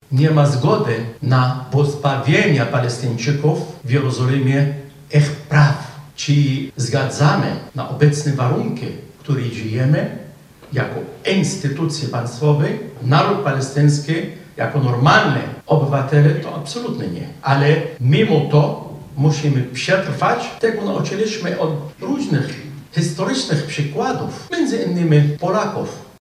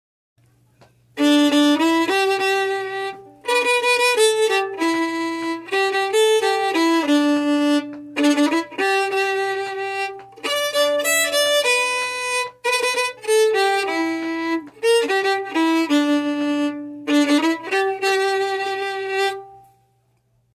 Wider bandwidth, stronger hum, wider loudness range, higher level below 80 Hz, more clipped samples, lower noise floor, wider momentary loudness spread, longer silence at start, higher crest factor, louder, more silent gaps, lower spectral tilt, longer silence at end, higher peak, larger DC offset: second, 11.5 kHz vs 15.5 kHz; neither; about the same, 4 LU vs 2 LU; first, -56 dBFS vs -70 dBFS; neither; second, -40 dBFS vs -63 dBFS; first, 11 LU vs 8 LU; second, 0.1 s vs 1.15 s; about the same, 16 dB vs 14 dB; about the same, -18 LUFS vs -19 LUFS; neither; first, -6.5 dB/octave vs -1.5 dB/octave; second, 0.15 s vs 0.95 s; first, -2 dBFS vs -6 dBFS; neither